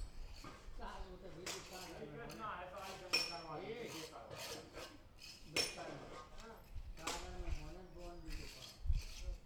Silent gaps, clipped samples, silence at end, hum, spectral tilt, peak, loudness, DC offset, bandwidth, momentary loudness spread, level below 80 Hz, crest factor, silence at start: none; under 0.1%; 0 s; none; -3 dB/octave; -22 dBFS; -47 LUFS; under 0.1%; 20 kHz; 16 LU; -50 dBFS; 24 dB; 0 s